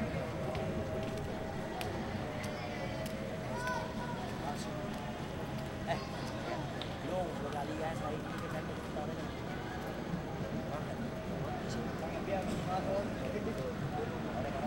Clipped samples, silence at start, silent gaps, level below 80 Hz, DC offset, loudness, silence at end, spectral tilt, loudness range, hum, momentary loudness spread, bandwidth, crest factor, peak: under 0.1%; 0 s; none; -52 dBFS; under 0.1%; -39 LUFS; 0 s; -6 dB/octave; 2 LU; none; 4 LU; 16.5 kHz; 22 dB; -16 dBFS